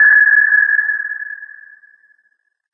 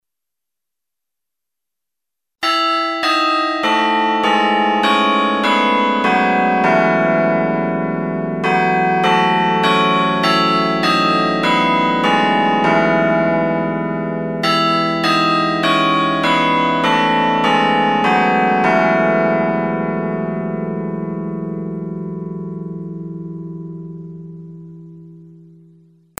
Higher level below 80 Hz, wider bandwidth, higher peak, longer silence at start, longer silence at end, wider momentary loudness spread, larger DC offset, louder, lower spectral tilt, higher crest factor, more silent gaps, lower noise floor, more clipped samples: second, under -90 dBFS vs -62 dBFS; second, 2.1 kHz vs 14 kHz; about the same, -2 dBFS vs 0 dBFS; second, 0 s vs 2.4 s; first, 1.3 s vs 0.85 s; first, 19 LU vs 13 LU; second, under 0.1% vs 0.3%; first, -11 LUFS vs -15 LUFS; about the same, -5 dB/octave vs -5.5 dB/octave; about the same, 12 dB vs 16 dB; neither; second, -62 dBFS vs -85 dBFS; neither